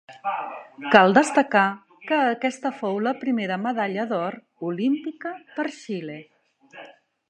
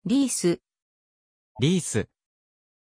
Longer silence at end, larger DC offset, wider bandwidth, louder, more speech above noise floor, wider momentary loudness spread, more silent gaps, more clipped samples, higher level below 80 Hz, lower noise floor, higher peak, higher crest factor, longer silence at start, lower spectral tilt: second, 0.4 s vs 0.9 s; neither; about the same, 11 kHz vs 10.5 kHz; about the same, -23 LUFS vs -25 LUFS; second, 25 dB vs over 66 dB; first, 16 LU vs 9 LU; second, none vs 0.82-1.55 s; neither; second, -72 dBFS vs -60 dBFS; second, -48 dBFS vs under -90 dBFS; first, 0 dBFS vs -10 dBFS; first, 24 dB vs 18 dB; about the same, 0.1 s vs 0.05 s; about the same, -5 dB/octave vs -5 dB/octave